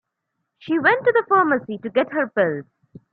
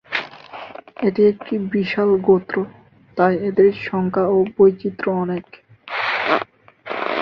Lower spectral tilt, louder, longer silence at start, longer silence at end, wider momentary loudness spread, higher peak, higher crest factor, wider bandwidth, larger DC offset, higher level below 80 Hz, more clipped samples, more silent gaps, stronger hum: about the same, -9 dB/octave vs -8 dB/octave; about the same, -20 LUFS vs -19 LUFS; first, 0.65 s vs 0.1 s; first, 0.5 s vs 0 s; second, 7 LU vs 16 LU; about the same, -2 dBFS vs -2 dBFS; about the same, 18 dB vs 16 dB; second, 4.8 kHz vs 6 kHz; neither; second, -68 dBFS vs -58 dBFS; neither; neither; neither